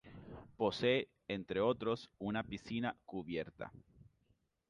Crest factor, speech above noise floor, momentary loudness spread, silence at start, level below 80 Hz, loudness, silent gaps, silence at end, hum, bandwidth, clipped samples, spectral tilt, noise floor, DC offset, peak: 20 dB; 39 dB; 17 LU; 0.05 s; -66 dBFS; -39 LUFS; none; 0.9 s; none; 10.5 kHz; under 0.1%; -6.5 dB/octave; -78 dBFS; under 0.1%; -20 dBFS